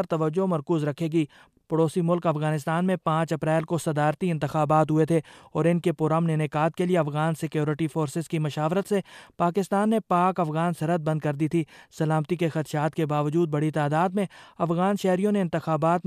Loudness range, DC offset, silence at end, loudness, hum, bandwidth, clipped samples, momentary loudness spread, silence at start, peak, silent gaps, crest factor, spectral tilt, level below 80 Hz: 2 LU; under 0.1%; 0.05 s; -25 LUFS; none; 14 kHz; under 0.1%; 5 LU; 0 s; -10 dBFS; none; 16 dB; -7.5 dB/octave; -64 dBFS